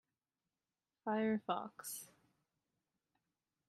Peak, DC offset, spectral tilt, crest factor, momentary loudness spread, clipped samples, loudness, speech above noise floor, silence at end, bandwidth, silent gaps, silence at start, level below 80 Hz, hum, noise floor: -24 dBFS; under 0.1%; -4.5 dB/octave; 22 dB; 12 LU; under 0.1%; -41 LUFS; over 50 dB; 1.6 s; 14 kHz; none; 1.05 s; under -90 dBFS; none; under -90 dBFS